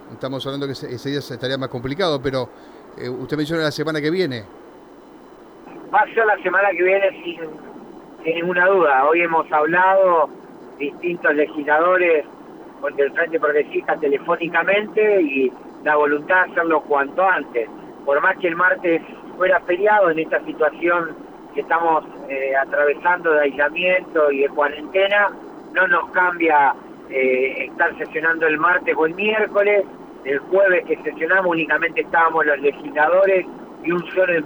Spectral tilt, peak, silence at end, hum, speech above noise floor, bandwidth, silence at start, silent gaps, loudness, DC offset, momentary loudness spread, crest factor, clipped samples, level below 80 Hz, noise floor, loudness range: -6 dB/octave; -4 dBFS; 0 s; none; 24 dB; over 20 kHz; 0 s; none; -18 LUFS; under 0.1%; 13 LU; 14 dB; under 0.1%; -58 dBFS; -43 dBFS; 6 LU